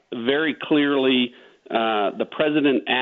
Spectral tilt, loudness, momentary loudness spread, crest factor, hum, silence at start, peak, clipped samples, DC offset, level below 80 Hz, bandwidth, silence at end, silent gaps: -7.5 dB/octave; -21 LUFS; 6 LU; 16 dB; none; 0.1 s; -6 dBFS; under 0.1%; under 0.1%; -68 dBFS; 4.3 kHz; 0 s; none